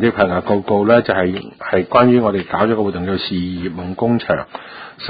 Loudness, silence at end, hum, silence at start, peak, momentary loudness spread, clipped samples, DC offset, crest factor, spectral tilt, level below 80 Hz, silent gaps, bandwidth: -16 LUFS; 0 s; none; 0 s; 0 dBFS; 12 LU; under 0.1%; under 0.1%; 16 dB; -10.5 dB/octave; -42 dBFS; none; 5 kHz